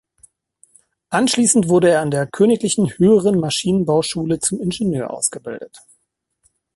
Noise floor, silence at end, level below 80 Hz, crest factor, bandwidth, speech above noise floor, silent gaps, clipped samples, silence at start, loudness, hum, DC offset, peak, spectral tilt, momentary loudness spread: -69 dBFS; 1 s; -52 dBFS; 18 dB; 12 kHz; 52 dB; none; under 0.1%; 1.1 s; -17 LUFS; none; under 0.1%; 0 dBFS; -4.5 dB/octave; 8 LU